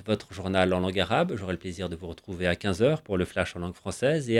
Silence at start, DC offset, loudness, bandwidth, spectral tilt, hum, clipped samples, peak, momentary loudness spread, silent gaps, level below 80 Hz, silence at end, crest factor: 0 s; under 0.1%; -28 LUFS; 13.5 kHz; -6 dB/octave; none; under 0.1%; -6 dBFS; 10 LU; none; -52 dBFS; 0 s; 22 dB